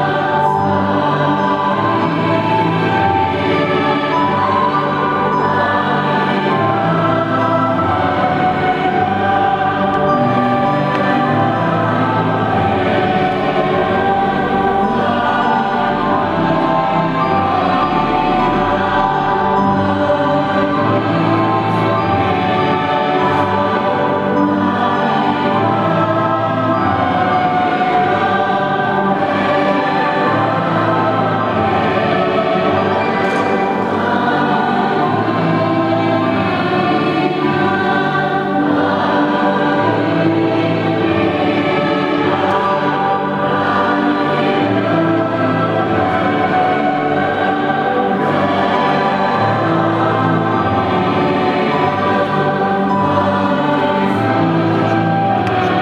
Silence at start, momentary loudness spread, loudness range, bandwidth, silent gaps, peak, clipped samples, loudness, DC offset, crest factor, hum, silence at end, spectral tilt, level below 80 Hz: 0 s; 1 LU; 0 LU; 9.8 kHz; none; 0 dBFS; under 0.1%; -15 LUFS; under 0.1%; 14 dB; none; 0 s; -7.5 dB/octave; -46 dBFS